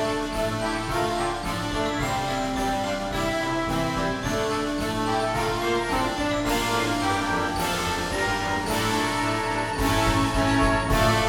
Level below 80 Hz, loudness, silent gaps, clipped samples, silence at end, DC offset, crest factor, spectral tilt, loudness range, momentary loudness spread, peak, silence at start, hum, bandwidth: -36 dBFS; -25 LUFS; none; under 0.1%; 0 s; under 0.1%; 16 dB; -4.5 dB/octave; 3 LU; 5 LU; -8 dBFS; 0 s; none; 19.5 kHz